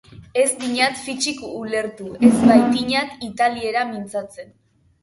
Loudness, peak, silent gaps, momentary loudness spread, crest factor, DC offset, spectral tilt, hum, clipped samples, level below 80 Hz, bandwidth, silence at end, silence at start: -19 LUFS; 0 dBFS; none; 15 LU; 20 dB; under 0.1%; -4 dB/octave; none; under 0.1%; -54 dBFS; 11.5 kHz; 0.6 s; 0.15 s